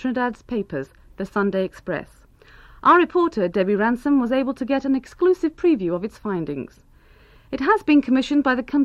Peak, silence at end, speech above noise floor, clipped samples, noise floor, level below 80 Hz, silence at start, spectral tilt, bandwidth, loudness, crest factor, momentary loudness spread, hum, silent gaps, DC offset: -4 dBFS; 0 s; 31 dB; under 0.1%; -51 dBFS; -50 dBFS; 0 s; -7 dB/octave; 8.4 kHz; -21 LUFS; 16 dB; 14 LU; none; none; under 0.1%